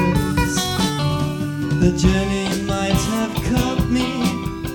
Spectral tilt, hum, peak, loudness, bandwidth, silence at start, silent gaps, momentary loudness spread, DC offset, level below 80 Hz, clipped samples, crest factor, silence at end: -5.5 dB/octave; none; -2 dBFS; -20 LUFS; 18 kHz; 0 s; none; 5 LU; under 0.1%; -30 dBFS; under 0.1%; 16 dB; 0 s